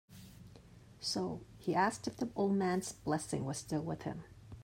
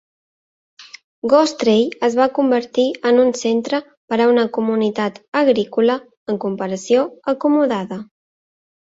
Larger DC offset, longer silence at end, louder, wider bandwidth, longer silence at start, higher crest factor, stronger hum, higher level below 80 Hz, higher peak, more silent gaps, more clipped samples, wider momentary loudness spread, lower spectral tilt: neither; second, 0 s vs 0.85 s; second, -37 LUFS vs -18 LUFS; first, 16 kHz vs 8 kHz; second, 0.1 s vs 0.8 s; about the same, 20 dB vs 16 dB; neither; about the same, -64 dBFS vs -64 dBFS; second, -18 dBFS vs -2 dBFS; second, none vs 1.04-1.22 s, 3.97-4.08 s, 5.28-5.32 s, 6.17-6.26 s; neither; first, 22 LU vs 9 LU; about the same, -5 dB/octave vs -5 dB/octave